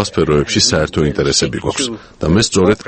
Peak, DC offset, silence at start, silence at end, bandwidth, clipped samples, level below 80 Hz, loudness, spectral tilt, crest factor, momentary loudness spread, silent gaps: 0 dBFS; under 0.1%; 0 s; 0 s; 8.8 kHz; under 0.1%; -32 dBFS; -14 LUFS; -4 dB/octave; 14 dB; 7 LU; none